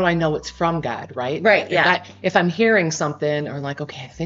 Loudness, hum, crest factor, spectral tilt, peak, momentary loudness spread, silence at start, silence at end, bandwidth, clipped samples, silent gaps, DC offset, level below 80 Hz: -20 LUFS; none; 18 dB; -3.5 dB/octave; -2 dBFS; 11 LU; 0 s; 0 s; 7.8 kHz; under 0.1%; none; under 0.1%; -52 dBFS